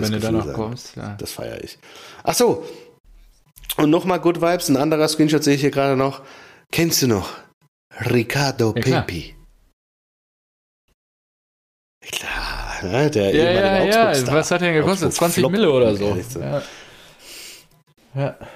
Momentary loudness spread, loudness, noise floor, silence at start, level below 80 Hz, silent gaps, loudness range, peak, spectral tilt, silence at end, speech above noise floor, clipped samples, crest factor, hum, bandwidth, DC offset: 20 LU; -19 LUFS; -43 dBFS; 0 s; -44 dBFS; 3.00-3.04 s, 7.53-7.61 s, 7.68-7.91 s, 9.73-10.88 s, 10.94-12.01 s; 9 LU; -6 dBFS; -5 dB/octave; 0 s; 24 dB; under 0.1%; 14 dB; none; 15.5 kHz; under 0.1%